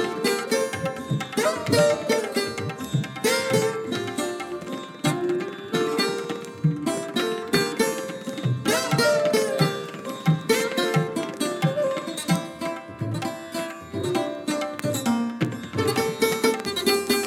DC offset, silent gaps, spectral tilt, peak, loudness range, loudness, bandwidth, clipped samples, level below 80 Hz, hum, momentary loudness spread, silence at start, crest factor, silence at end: under 0.1%; none; -4.5 dB/octave; -8 dBFS; 4 LU; -25 LUFS; 17.5 kHz; under 0.1%; -62 dBFS; none; 10 LU; 0 s; 18 dB; 0 s